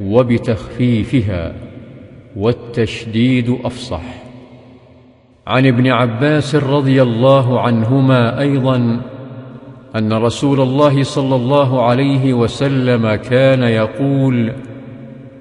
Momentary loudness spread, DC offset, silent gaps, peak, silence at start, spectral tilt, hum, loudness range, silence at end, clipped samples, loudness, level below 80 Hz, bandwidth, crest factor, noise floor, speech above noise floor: 20 LU; under 0.1%; none; 0 dBFS; 0 s; -7.5 dB/octave; none; 7 LU; 0 s; under 0.1%; -14 LUFS; -44 dBFS; 10.5 kHz; 14 dB; -46 dBFS; 33 dB